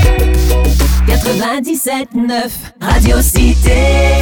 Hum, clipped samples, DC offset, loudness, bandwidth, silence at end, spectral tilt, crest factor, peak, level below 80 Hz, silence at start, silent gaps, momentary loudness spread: none; under 0.1%; under 0.1%; -12 LUFS; 19 kHz; 0 s; -5 dB/octave; 10 dB; 0 dBFS; -12 dBFS; 0 s; none; 6 LU